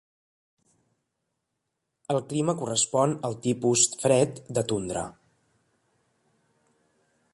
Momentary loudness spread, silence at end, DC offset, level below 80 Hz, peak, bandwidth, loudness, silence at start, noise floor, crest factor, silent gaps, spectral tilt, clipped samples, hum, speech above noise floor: 11 LU; 2.25 s; under 0.1%; -62 dBFS; -6 dBFS; 11.5 kHz; -25 LUFS; 2.1 s; -81 dBFS; 24 dB; none; -4 dB/octave; under 0.1%; none; 56 dB